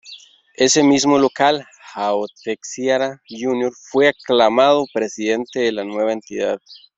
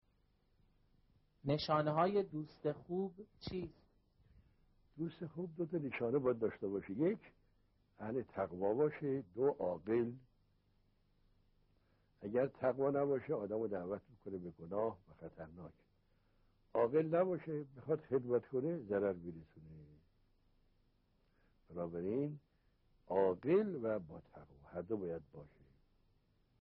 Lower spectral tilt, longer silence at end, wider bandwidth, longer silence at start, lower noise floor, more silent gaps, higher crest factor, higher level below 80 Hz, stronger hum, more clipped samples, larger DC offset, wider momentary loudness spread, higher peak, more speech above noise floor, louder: second, -3 dB/octave vs -6.5 dB/octave; second, 0.25 s vs 1.15 s; first, 8.2 kHz vs 5.6 kHz; second, 0.05 s vs 1.45 s; second, -43 dBFS vs -76 dBFS; neither; about the same, 16 dB vs 20 dB; first, -62 dBFS vs -72 dBFS; neither; neither; neither; second, 12 LU vs 18 LU; first, -2 dBFS vs -22 dBFS; second, 25 dB vs 37 dB; first, -18 LUFS vs -39 LUFS